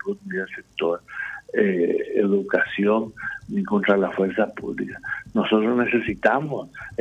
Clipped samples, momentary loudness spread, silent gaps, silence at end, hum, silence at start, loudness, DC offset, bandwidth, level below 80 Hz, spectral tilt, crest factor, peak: under 0.1%; 11 LU; none; 0.05 s; none; 0.05 s; -23 LUFS; under 0.1%; 8.2 kHz; -56 dBFS; -7.5 dB/octave; 18 dB; -6 dBFS